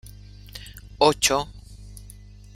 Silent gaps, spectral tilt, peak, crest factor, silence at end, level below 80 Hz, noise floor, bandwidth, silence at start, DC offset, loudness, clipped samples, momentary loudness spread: none; -2.5 dB/octave; -4 dBFS; 24 dB; 0.5 s; -44 dBFS; -44 dBFS; 16.5 kHz; 0.05 s; under 0.1%; -21 LUFS; under 0.1%; 26 LU